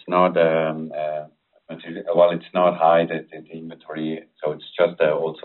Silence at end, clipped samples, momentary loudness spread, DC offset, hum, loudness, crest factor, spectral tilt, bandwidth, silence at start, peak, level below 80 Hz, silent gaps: 0.05 s; under 0.1%; 19 LU; under 0.1%; none; -21 LUFS; 18 dB; -4.5 dB/octave; 4.2 kHz; 0.05 s; -4 dBFS; -70 dBFS; none